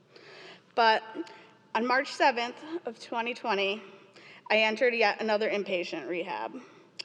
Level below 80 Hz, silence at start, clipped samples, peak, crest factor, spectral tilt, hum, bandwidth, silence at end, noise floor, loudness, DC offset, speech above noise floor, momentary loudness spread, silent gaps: under -90 dBFS; 0.25 s; under 0.1%; -10 dBFS; 22 dB; -3.5 dB/octave; none; 10 kHz; 0 s; -52 dBFS; -28 LUFS; under 0.1%; 23 dB; 17 LU; none